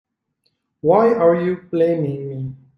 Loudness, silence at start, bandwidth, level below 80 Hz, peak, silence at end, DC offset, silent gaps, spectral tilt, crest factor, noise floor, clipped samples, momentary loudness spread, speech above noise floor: -18 LUFS; 0.85 s; 5.6 kHz; -60 dBFS; -2 dBFS; 0.2 s; under 0.1%; none; -10 dB/octave; 16 dB; -70 dBFS; under 0.1%; 13 LU; 54 dB